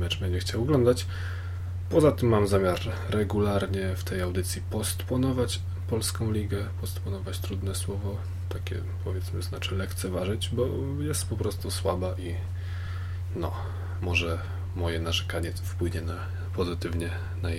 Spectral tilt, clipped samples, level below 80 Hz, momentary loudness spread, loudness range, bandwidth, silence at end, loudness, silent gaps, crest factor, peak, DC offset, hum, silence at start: -5.5 dB/octave; under 0.1%; -42 dBFS; 10 LU; 6 LU; 15.5 kHz; 0 s; -29 LUFS; none; 20 dB; -8 dBFS; under 0.1%; none; 0 s